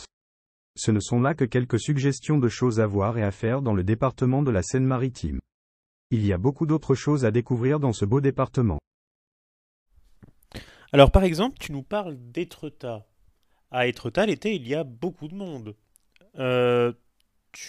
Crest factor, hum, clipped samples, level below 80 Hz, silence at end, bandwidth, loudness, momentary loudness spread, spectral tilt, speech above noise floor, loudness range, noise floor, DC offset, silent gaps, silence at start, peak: 24 dB; none; under 0.1%; -40 dBFS; 0 s; 12.5 kHz; -24 LUFS; 14 LU; -6.5 dB/octave; 44 dB; 5 LU; -68 dBFS; under 0.1%; 0.13-0.74 s, 5.54-6.10 s, 8.87-9.86 s; 0 s; -2 dBFS